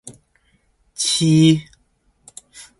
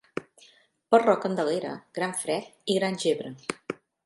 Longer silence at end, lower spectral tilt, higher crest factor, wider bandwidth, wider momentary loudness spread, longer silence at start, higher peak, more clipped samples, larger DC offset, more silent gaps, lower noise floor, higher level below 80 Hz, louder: about the same, 0.2 s vs 0.3 s; about the same, -5 dB/octave vs -4.5 dB/octave; about the same, 18 dB vs 22 dB; about the same, 11.5 kHz vs 11.5 kHz; first, 26 LU vs 16 LU; about the same, 0.05 s vs 0.15 s; first, -2 dBFS vs -6 dBFS; neither; neither; neither; about the same, -62 dBFS vs -59 dBFS; first, -56 dBFS vs -76 dBFS; first, -16 LUFS vs -27 LUFS